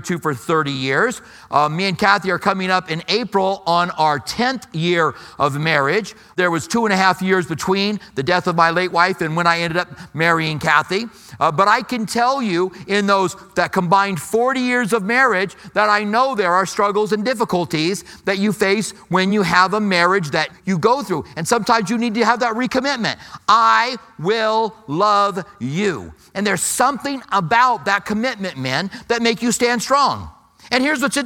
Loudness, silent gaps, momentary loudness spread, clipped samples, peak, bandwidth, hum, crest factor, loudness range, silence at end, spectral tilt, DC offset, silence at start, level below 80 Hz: -18 LUFS; none; 7 LU; under 0.1%; 0 dBFS; 17.5 kHz; none; 18 dB; 2 LU; 0 s; -4 dB/octave; under 0.1%; 0 s; -54 dBFS